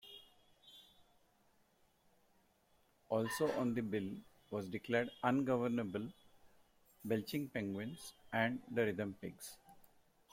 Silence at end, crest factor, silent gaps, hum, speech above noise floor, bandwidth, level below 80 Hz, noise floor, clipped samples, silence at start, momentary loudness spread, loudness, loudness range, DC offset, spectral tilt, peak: 0.45 s; 24 dB; none; none; 35 dB; 16.5 kHz; -76 dBFS; -74 dBFS; under 0.1%; 0.05 s; 17 LU; -40 LUFS; 4 LU; under 0.1%; -6 dB/octave; -18 dBFS